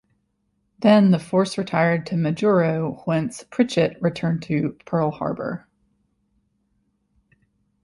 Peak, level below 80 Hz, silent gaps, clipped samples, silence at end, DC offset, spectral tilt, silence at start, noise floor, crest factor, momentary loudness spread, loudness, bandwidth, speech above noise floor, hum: -4 dBFS; -60 dBFS; none; under 0.1%; 2.25 s; under 0.1%; -7 dB/octave; 0.8 s; -71 dBFS; 18 dB; 10 LU; -21 LUFS; 11.5 kHz; 50 dB; none